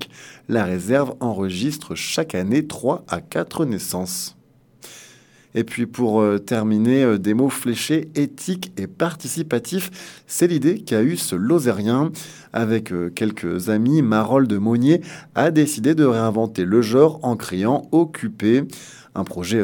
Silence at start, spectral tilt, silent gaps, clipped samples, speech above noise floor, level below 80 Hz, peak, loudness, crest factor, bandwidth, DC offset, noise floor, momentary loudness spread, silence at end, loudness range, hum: 0 s; -5.5 dB/octave; none; under 0.1%; 30 dB; -60 dBFS; 0 dBFS; -20 LUFS; 20 dB; 19 kHz; under 0.1%; -49 dBFS; 10 LU; 0 s; 6 LU; none